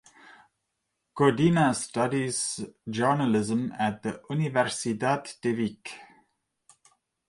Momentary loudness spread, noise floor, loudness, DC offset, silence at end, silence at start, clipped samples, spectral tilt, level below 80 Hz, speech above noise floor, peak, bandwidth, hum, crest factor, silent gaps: 13 LU; -81 dBFS; -27 LUFS; under 0.1%; 1.25 s; 1.15 s; under 0.1%; -5 dB/octave; -64 dBFS; 54 dB; -8 dBFS; 11.5 kHz; none; 20 dB; none